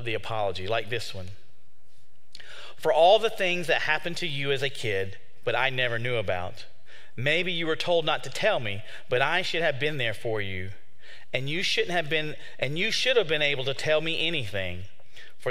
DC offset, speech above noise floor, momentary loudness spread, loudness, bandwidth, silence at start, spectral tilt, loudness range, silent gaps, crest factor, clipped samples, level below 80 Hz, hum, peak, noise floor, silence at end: 3%; 38 dB; 14 LU; -26 LUFS; 16 kHz; 0 s; -4 dB/octave; 3 LU; none; 22 dB; under 0.1%; -64 dBFS; none; -6 dBFS; -65 dBFS; 0 s